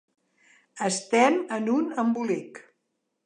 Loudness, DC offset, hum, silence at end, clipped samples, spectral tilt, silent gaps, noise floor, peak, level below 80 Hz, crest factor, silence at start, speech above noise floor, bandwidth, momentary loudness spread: -25 LUFS; under 0.1%; none; 0.65 s; under 0.1%; -4 dB/octave; none; -78 dBFS; -6 dBFS; -82 dBFS; 20 dB; 0.75 s; 53 dB; 11 kHz; 10 LU